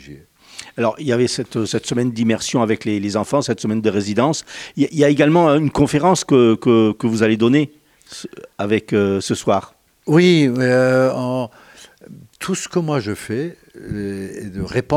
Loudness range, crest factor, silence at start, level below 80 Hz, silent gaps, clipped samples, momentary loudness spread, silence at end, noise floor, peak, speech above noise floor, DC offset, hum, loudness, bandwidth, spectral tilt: 5 LU; 16 dB; 0.05 s; -50 dBFS; none; under 0.1%; 16 LU; 0 s; -44 dBFS; 0 dBFS; 27 dB; under 0.1%; none; -17 LUFS; 15 kHz; -5.5 dB/octave